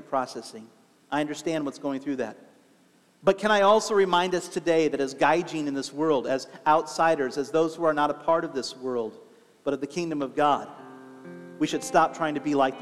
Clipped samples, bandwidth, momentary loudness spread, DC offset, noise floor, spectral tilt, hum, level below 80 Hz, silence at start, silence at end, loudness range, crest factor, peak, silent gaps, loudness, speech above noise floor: under 0.1%; 14 kHz; 13 LU; under 0.1%; -61 dBFS; -4.5 dB/octave; none; -68 dBFS; 0 s; 0 s; 6 LU; 20 dB; -6 dBFS; none; -26 LUFS; 36 dB